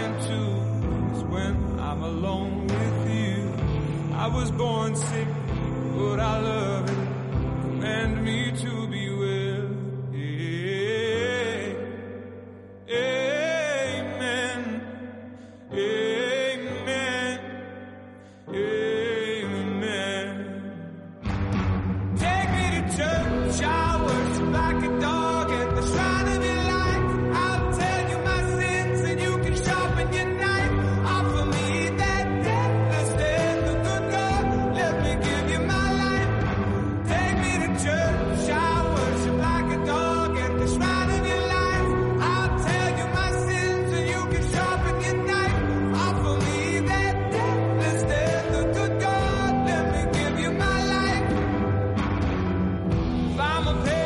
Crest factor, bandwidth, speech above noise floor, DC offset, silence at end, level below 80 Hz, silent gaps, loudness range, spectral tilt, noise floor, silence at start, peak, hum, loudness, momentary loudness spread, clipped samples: 10 dB; 11.5 kHz; 20 dB; under 0.1%; 0 s; -36 dBFS; none; 5 LU; -5.5 dB/octave; -45 dBFS; 0 s; -14 dBFS; none; -25 LUFS; 6 LU; under 0.1%